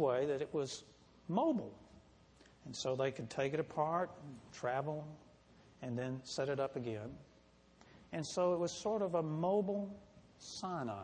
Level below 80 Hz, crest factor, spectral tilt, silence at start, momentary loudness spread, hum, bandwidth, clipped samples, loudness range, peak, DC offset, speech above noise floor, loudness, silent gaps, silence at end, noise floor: -72 dBFS; 20 dB; -5.5 dB/octave; 0 s; 17 LU; none; 10 kHz; under 0.1%; 4 LU; -20 dBFS; under 0.1%; 28 dB; -39 LUFS; none; 0 s; -66 dBFS